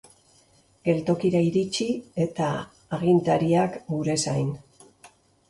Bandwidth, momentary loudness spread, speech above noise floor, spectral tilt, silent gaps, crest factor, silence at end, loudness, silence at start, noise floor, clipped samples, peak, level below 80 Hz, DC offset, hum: 11.5 kHz; 9 LU; 36 dB; -6 dB/octave; none; 18 dB; 0.4 s; -25 LUFS; 0.85 s; -60 dBFS; under 0.1%; -8 dBFS; -60 dBFS; under 0.1%; none